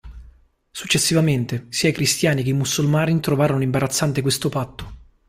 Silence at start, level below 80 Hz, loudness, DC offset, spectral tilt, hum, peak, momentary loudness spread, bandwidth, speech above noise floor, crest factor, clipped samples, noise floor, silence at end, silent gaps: 0.05 s; -46 dBFS; -20 LUFS; under 0.1%; -4.5 dB/octave; none; -6 dBFS; 13 LU; 16 kHz; 31 dB; 16 dB; under 0.1%; -50 dBFS; 0.3 s; none